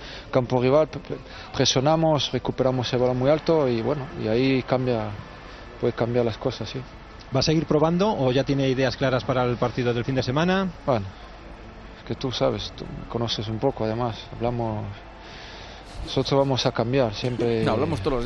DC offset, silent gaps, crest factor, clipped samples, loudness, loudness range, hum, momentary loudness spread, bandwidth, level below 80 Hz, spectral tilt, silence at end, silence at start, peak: under 0.1%; none; 18 dB; under 0.1%; -24 LUFS; 6 LU; none; 18 LU; 9.2 kHz; -44 dBFS; -6 dB/octave; 0 s; 0 s; -6 dBFS